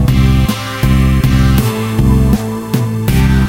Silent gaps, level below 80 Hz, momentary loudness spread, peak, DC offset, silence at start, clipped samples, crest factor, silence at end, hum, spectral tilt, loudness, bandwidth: none; -16 dBFS; 5 LU; 0 dBFS; under 0.1%; 0 s; under 0.1%; 10 dB; 0 s; none; -6.5 dB/octave; -12 LUFS; 17 kHz